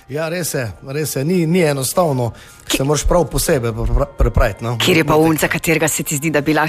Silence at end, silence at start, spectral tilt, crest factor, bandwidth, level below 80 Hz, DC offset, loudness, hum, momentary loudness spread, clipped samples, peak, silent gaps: 0 s; 0.1 s; -4.5 dB/octave; 14 dB; 15.5 kHz; -26 dBFS; under 0.1%; -17 LUFS; none; 8 LU; under 0.1%; -2 dBFS; none